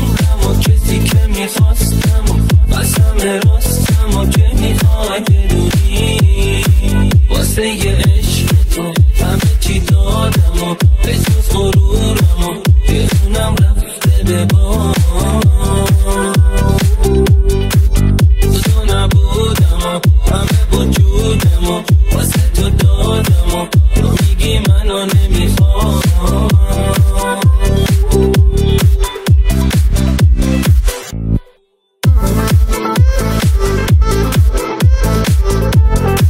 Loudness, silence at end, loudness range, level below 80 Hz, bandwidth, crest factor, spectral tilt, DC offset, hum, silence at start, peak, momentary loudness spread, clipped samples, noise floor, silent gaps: -12 LUFS; 0 s; 1 LU; -12 dBFS; 16.5 kHz; 10 dB; -5.5 dB/octave; under 0.1%; none; 0 s; 0 dBFS; 2 LU; under 0.1%; -56 dBFS; none